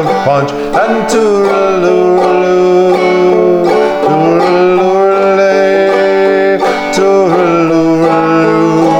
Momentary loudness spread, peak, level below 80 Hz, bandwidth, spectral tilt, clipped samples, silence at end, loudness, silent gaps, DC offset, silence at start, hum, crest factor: 2 LU; 0 dBFS; -44 dBFS; 10.5 kHz; -6 dB/octave; under 0.1%; 0 s; -9 LUFS; none; under 0.1%; 0 s; none; 8 dB